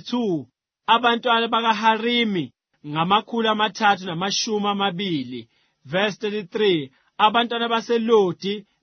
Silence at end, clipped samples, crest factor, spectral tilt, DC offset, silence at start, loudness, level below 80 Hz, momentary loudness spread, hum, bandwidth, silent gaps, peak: 0.2 s; under 0.1%; 20 dB; -4 dB/octave; under 0.1%; 0.05 s; -21 LUFS; -70 dBFS; 10 LU; none; 6.6 kHz; none; -2 dBFS